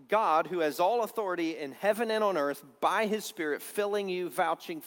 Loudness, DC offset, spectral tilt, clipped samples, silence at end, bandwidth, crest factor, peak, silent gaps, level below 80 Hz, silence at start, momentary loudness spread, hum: -30 LUFS; under 0.1%; -4 dB/octave; under 0.1%; 0 s; 18 kHz; 18 dB; -12 dBFS; none; -82 dBFS; 0.1 s; 6 LU; none